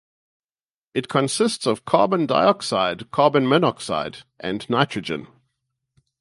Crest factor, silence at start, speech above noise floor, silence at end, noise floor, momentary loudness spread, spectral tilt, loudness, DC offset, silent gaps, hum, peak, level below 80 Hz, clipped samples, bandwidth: 22 dB; 0.95 s; over 69 dB; 0.95 s; under -90 dBFS; 11 LU; -5 dB/octave; -21 LUFS; under 0.1%; none; none; -2 dBFS; -60 dBFS; under 0.1%; 11.5 kHz